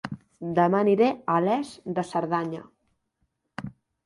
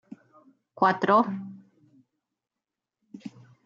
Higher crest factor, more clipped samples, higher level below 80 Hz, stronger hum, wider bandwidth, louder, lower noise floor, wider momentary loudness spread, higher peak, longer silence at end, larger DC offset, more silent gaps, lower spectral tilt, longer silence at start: about the same, 18 dB vs 22 dB; neither; first, -64 dBFS vs -82 dBFS; neither; first, 11.5 kHz vs 7.2 kHz; about the same, -25 LUFS vs -24 LUFS; second, -75 dBFS vs -88 dBFS; second, 18 LU vs 23 LU; about the same, -8 dBFS vs -8 dBFS; about the same, 0.35 s vs 0.4 s; neither; neither; first, -7.5 dB/octave vs -4.5 dB/octave; second, 0.05 s vs 0.8 s